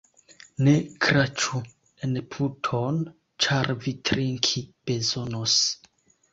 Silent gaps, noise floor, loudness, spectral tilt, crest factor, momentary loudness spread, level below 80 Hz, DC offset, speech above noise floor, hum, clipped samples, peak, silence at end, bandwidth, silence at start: none; -53 dBFS; -25 LUFS; -4 dB/octave; 22 dB; 11 LU; -56 dBFS; under 0.1%; 28 dB; none; under 0.1%; -4 dBFS; 0.55 s; 7.8 kHz; 0.6 s